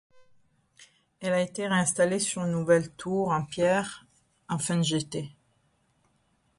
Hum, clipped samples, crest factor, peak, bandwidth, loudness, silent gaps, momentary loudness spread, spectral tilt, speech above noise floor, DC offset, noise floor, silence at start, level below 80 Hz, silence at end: none; under 0.1%; 20 dB; -10 dBFS; 11.5 kHz; -27 LUFS; none; 12 LU; -4.5 dB/octave; 43 dB; under 0.1%; -70 dBFS; 0.8 s; -64 dBFS; 1.25 s